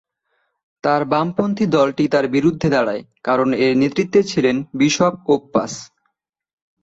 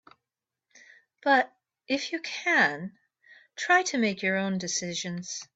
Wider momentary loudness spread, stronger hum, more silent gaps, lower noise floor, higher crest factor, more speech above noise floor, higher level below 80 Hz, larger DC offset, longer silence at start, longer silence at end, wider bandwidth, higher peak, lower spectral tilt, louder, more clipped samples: second, 6 LU vs 13 LU; neither; neither; second, -72 dBFS vs -89 dBFS; about the same, 16 dB vs 20 dB; second, 55 dB vs 62 dB; first, -54 dBFS vs -76 dBFS; neither; second, 0.85 s vs 1.25 s; first, 0.95 s vs 0.1 s; about the same, 8 kHz vs 8.4 kHz; first, -2 dBFS vs -8 dBFS; first, -5.5 dB/octave vs -3 dB/octave; first, -18 LUFS vs -27 LUFS; neither